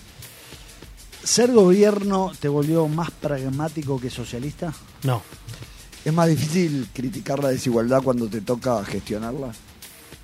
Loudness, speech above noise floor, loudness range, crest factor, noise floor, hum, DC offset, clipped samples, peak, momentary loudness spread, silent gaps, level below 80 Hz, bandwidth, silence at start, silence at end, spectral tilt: -22 LUFS; 22 dB; 6 LU; 20 dB; -44 dBFS; none; under 0.1%; under 0.1%; -2 dBFS; 24 LU; none; -48 dBFS; 16 kHz; 0 s; 0 s; -5.5 dB/octave